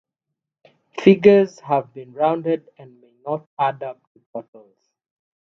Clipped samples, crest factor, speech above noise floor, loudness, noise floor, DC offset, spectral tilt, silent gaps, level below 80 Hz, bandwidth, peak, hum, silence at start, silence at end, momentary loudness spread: under 0.1%; 22 dB; 64 dB; -19 LUFS; -83 dBFS; under 0.1%; -7.5 dB/octave; 3.46-3.57 s, 4.07-4.15 s, 4.26-4.33 s; -64 dBFS; 6.6 kHz; 0 dBFS; none; 0.95 s; 1.15 s; 23 LU